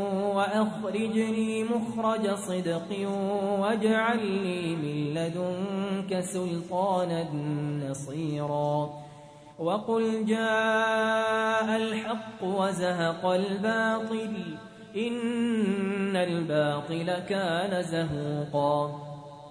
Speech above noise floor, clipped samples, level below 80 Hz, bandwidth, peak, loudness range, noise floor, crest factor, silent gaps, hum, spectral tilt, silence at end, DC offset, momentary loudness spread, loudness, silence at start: 21 dB; under 0.1%; -66 dBFS; 11 kHz; -12 dBFS; 4 LU; -49 dBFS; 16 dB; none; none; -6 dB/octave; 0 s; under 0.1%; 7 LU; -28 LUFS; 0 s